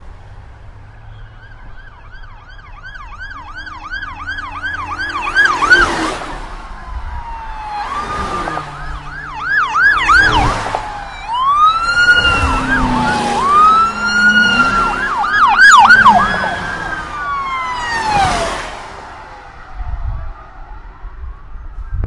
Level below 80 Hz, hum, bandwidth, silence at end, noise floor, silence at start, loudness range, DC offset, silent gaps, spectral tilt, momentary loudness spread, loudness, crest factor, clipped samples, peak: -30 dBFS; none; 12 kHz; 0 s; -35 dBFS; 0 s; 17 LU; under 0.1%; none; -3 dB/octave; 22 LU; -12 LUFS; 14 dB; under 0.1%; 0 dBFS